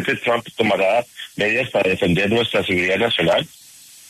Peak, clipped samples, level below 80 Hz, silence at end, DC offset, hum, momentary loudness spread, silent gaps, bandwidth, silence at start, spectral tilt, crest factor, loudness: -4 dBFS; under 0.1%; -52 dBFS; 0.6 s; under 0.1%; none; 5 LU; none; 13.5 kHz; 0 s; -5 dB/octave; 14 dB; -18 LUFS